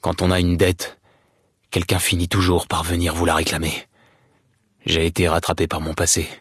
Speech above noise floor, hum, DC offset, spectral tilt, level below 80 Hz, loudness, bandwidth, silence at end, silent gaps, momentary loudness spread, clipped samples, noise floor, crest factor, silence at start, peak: 43 dB; none; under 0.1%; -4 dB/octave; -40 dBFS; -20 LUFS; 12 kHz; 0.05 s; none; 8 LU; under 0.1%; -63 dBFS; 16 dB; 0.05 s; -4 dBFS